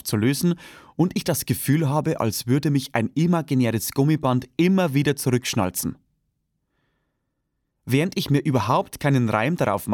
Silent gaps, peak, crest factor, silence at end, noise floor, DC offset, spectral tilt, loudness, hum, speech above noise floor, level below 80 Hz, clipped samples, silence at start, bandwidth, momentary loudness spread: none; -6 dBFS; 16 dB; 0 s; -76 dBFS; under 0.1%; -6 dB/octave; -22 LUFS; none; 54 dB; -56 dBFS; under 0.1%; 0.05 s; 19 kHz; 4 LU